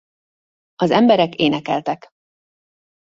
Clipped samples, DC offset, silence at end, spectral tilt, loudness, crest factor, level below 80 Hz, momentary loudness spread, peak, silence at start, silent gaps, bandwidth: under 0.1%; under 0.1%; 1.1 s; -6.5 dB/octave; -17 LUFS; 20 dB; -60 dBFS; 11 LU; 0 dBFS; 0.8 s; none; 7.6 kHz